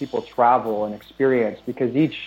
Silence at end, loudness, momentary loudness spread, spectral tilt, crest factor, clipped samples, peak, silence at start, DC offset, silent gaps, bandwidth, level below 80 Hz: 0 s; -21 LUFS; 9 LU; -8 dB/octave; 16 dB; under 0.1%; -4 dBFS; 0 s; under 0.1%; none; 16.5 kHz; -60 dBFS